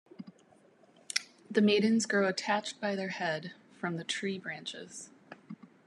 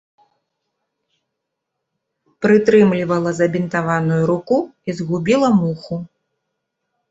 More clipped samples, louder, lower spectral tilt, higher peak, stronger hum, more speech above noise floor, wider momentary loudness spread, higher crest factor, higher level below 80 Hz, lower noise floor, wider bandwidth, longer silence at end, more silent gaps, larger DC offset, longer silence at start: neither; second, -32 LUFS vs -17 LUFS; second, -4 dB/octave vs -7.5 dB/octave; second, -10 dBFS vs -2 dBFS; neither; second, 32 dB vs 62 dB; first, 23 LU vs 13 LU; first, 24 dB vs 18 dB; second, -88 dBFS vs -58 dBFS; second, -63 dBFS vs -78 dBFS; first, 12 kHz vs 8 kHz; second, 0.2 s vs 1.05 s; neither; neither; second, 0.2 s vs 2.4 s